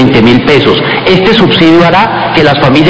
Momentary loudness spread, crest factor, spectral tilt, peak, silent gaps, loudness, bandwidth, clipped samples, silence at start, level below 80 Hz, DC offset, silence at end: 3 LU; 6 dB; -6.5 dB/octave; 0 dBFS; none; -5 LUFS; 8 kHz; 8%; 0 s; -32 dBFS; under 0.1%; 0 s